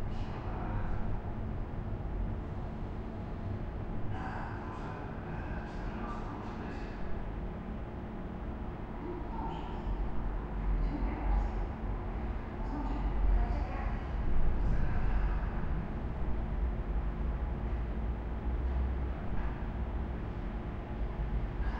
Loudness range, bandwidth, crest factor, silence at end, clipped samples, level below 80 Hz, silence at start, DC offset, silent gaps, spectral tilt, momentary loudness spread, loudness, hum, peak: 5 LU; 5.4 kHz; 16 dB; 0 s; under 0.1%; -36 dBFS; 0 s; under 0.1%; none; -9 dB/octave; 7 LU; -38 LUFS; none; -18 dBFS